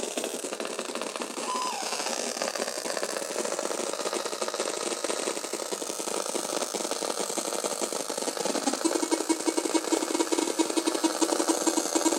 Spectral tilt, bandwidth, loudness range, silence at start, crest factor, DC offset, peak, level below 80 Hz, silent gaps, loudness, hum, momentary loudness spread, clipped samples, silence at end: -1 dB/octave; 17 kHz; 4 LU; 0 s; 20 dB; under 0.1%; -10 dBFS; -84 dBFS; none; -29 LUFS; none; 6 LU; under 0.1%; 0 s